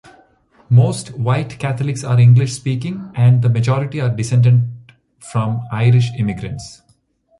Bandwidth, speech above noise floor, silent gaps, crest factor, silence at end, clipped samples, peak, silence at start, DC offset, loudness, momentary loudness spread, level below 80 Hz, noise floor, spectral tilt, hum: 11.5 kHz; 43 dB; none; 14 dB; 0.65 s; under 0.1%; -2 dBFS; 0.7 s; under 0.1%; -16 LUFS; 12 LU; -48 dBFS; -58 dBFS; -7 dB/octave; none